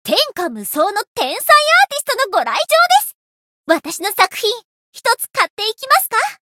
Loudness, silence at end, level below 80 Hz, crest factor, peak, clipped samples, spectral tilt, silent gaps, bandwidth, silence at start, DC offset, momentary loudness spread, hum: -15 LUFS; 0.2 s; -68 dBFS; 16 dB; 0 dBFS; under 0.1%; -0.5 dB/octave; 1.07-1.15 s, 3.14-3.64 s, 4.64-4.93 s, 5.50-5.57 s; 17.5 kHz; 0.05 s; under 0.1%; 10 LU; none